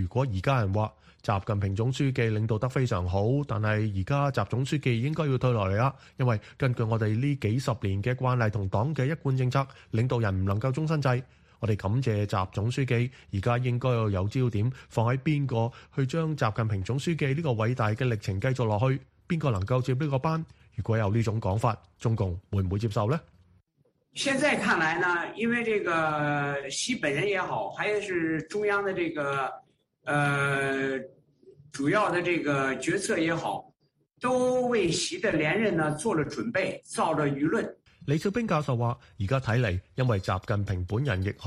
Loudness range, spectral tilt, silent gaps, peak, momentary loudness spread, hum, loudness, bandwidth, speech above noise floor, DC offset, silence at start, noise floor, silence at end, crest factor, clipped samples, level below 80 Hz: 2 LU; -6 dB/octave; none; -10 dBFS; 5 LU; none; -28 LUFS; 12 kHz; 43 dB; under 0.1%; 0 s; -70 dBFS; 0 s; 18 dB; under 0.1%; -54 dBFS